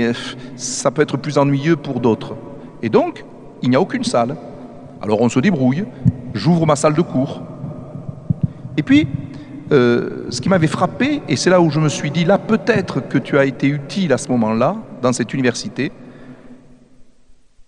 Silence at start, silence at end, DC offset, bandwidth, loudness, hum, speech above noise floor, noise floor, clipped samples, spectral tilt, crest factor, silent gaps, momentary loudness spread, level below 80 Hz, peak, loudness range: 0 s; 0.05 s; under 0.1%; 11 kHz; -17 LUFS; none; 29 dB; -45 dBFS; under 0.1%; -6 dB/octave; 18 dB; none; 15 LU; -50 dBFS; 0 dBFS; 4 LU